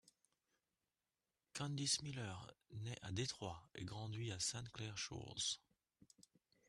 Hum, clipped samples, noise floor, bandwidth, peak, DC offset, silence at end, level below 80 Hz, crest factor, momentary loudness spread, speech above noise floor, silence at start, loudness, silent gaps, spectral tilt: none; under 0.1%; under -90 dBFS; 12.5 kHz; -26 dBFS; under 0.1%; 1.1 s; -74 dBFS; 24 dB; 12 LU; over 44 dB; 1.55 s; -45 LUFS; none; -3 dB/octave